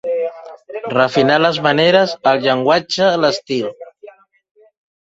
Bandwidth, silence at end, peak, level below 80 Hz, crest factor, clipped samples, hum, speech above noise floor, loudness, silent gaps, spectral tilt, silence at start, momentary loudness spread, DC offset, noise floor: 8 kHz; 0.95 s; 0 dBFS; -58 dBFS; 16 dB; under 0.1%; none; 27 dB; -15 LUFS; none; -5 dB/octave; 0.05 s; 11 LU; under 0.1%; -42 dBFS